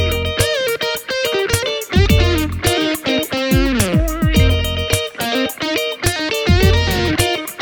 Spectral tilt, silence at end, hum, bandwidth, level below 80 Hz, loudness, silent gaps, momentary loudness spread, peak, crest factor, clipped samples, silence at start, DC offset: -4.5 dB/octave; 0 s; none; over 20 kHz; -24 dBFS; -16 LUFS; none; 5 LU; 0 dBFS; 16 dB; under 0.1%; 0 s; under 0.1%